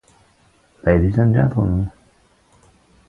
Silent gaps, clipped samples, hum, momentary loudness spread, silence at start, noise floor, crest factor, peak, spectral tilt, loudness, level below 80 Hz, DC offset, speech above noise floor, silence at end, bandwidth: none; under 0.1%; none; 8 LU; 0.85 s; -56 dBFS; 20 dB; 0 dBFS; -10.5 dB/octave; -18 LUFS; -32 dBFS; under 0.1%; 41 dB; 1.2 s; 4.5 kHz